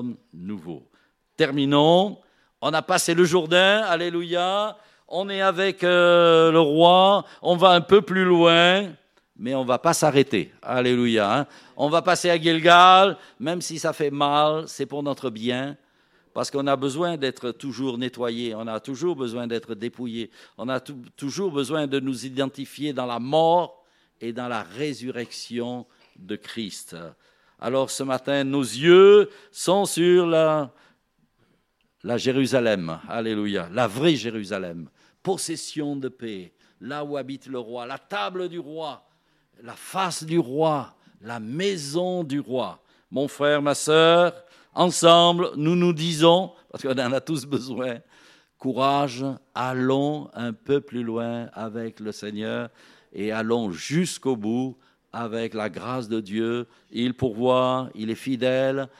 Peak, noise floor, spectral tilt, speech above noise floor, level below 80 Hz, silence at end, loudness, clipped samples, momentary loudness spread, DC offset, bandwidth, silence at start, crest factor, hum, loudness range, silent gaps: 0 dBFS; -68 dBFS; -4.5 dB/octave; 46 dB; -68 dBFS; 0.1 s; -22 LUFS; under 0.1%; 18 LU; under 0.1%; 15 kHz; 0 s; 22 dB; none; 12 LU; none